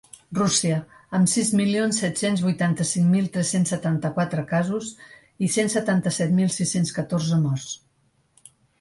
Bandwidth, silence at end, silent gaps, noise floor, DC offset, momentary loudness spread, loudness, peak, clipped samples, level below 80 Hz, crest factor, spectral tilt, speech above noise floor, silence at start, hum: 11.5 kHz; 1.05 s; none; -65 dBFS; under 0.1%; 8 LU; -23 LUFS; -6 dBFS; under 0.1%; -60 dBFS; 16 dB; -5 dB/octave; 43 dB; 0.3 s; none